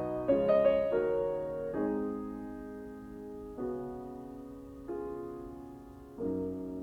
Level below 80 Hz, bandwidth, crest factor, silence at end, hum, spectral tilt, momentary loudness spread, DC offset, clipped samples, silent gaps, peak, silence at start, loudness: -58 dBFS; 6.4 kHz; 18 dB; 0 s; none; -8.5 dB/octave; 19 LU; under 0.1%; under 0.1%; none; -16 dBFS; 0 s; -34 LUFS